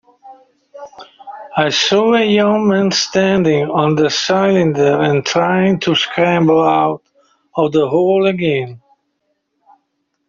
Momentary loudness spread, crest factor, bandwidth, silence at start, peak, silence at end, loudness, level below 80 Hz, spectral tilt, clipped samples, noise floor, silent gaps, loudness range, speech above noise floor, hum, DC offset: 8 LU; 12 dB; 7.6 kHz; 0.25 s; -2 dBFS; 1.5 s; -14 LUFS; -54 dBFS; -5 dB/octave; under 0.1%; -68 dBFS; none; 3 LU; 55 dB; none; under 0.1%